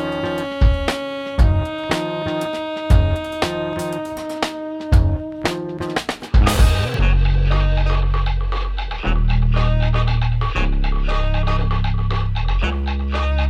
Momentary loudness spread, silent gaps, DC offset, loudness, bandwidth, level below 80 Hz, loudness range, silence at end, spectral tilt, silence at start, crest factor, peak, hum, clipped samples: 7 LU; none; under 0.1%; -20 LUFS; 13.5 kHz; -20 dBFS; 2 LU; 0 s; -6 dB/octave; 0 s; 16 dB; -2 dBFS; none; under 0.1%